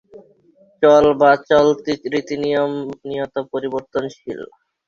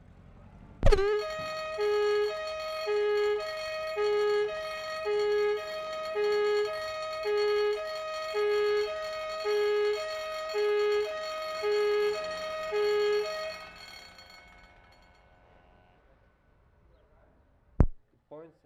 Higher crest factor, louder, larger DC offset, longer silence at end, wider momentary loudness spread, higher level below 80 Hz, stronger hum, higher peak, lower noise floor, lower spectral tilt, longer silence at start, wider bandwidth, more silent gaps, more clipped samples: second, 16 dB vs 24 dB; first, -17 LUFS vs -30 LUFS; neither; first, 0.4 s vs 0.15 s; first, 17 LU vs 8 LU; second, -56 dBFS vs -40 dBFS; neither; first, -2 dBFS vs -6 dBFS; second, -54 dBFS vs -64 dBFS; about the same, -5.5 dB/octave vs -5 dB/octave; second, 0.15 s vs 0.3 s; second, 7.2 kHz vs 14 kHz; neither; neither